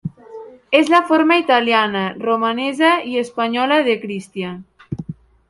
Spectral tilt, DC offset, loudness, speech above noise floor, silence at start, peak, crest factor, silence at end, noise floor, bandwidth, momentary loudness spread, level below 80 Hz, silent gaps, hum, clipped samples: -5.5 dB/octave; under 0.1%; -16 LUFS; 21 dB; 0.05 s; 0 dBFS; 18 dB; 0.35 s; -37 dBFS; 11.5 kHz; 18 LU; -56 dBFS; none; none; under 0.1%